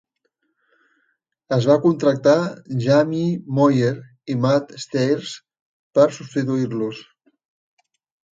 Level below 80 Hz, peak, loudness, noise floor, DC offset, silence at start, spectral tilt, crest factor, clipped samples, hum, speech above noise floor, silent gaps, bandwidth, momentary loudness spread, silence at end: -64 dBFS; -4 dBFS; -20 LUFS; -72 dBFS; under 0.1%; 1.5 s; -7 dB/octave; 18 dB; under 0.1%; none; 53 dB; 5.60-5.91 s; 7.8 kHz; 11 LU; 1.35 s